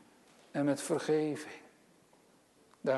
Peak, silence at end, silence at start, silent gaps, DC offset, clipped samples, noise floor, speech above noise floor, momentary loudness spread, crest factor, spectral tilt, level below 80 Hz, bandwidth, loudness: -20 dBFS; 0 s; 0.55 s; none; under 0.1%; under 0.1%; -65 dBFS; 33 dB; 15 LU; 18 dB; -5.5 dB/octave; -86 dBFS; 12.5 kHz; -34 LUFS